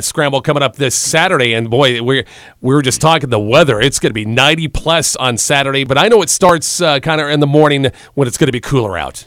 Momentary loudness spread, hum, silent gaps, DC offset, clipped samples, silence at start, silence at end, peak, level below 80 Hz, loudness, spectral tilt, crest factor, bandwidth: 6 LU; none; none; under 0.1%; 0.2%; 0 s; 0.05 s; 0 dBFS; -36 dBFS; -12 LUFS; -3.5 dB/octave; 12 dB; 16.5 kHz